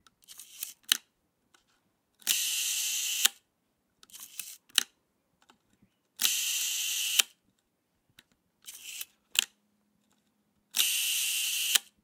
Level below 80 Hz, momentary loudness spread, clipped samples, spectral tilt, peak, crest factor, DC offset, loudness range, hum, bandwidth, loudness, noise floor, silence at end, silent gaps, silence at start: -88 dBFS; 16 LU; under 0.1%; 4.5 dB/octave; -2 dBFS; 32 dB; under 0.1%; 4 LU; none; 18 kHz; -28 LUFS; -77 dBFS; 0.2 s; none; 0.3 s